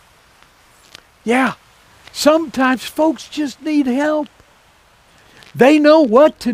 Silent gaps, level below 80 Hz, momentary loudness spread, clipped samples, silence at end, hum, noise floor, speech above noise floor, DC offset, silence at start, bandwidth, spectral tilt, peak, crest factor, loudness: none; -56 dBFS; 18 LU; under 0.1%; 0 s; none; -51 dBFS; 37 dB; under 0.1%; 1.25 s; 16 kHz; -4.5 dB/octave; 0 dBFS; 16 dB; -15 LUFS